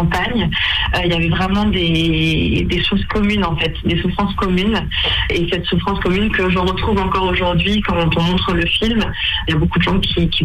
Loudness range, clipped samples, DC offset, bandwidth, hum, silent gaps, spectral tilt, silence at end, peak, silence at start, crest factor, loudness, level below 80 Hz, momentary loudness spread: 1 LU; under 0.1%; under 0.1%; 13 kHz; none; none; -6.5 dB/octave; 0 s; -6 dBFS; 0 s; 10 dB; -16 LUFS; -26 dBFS; 2 LU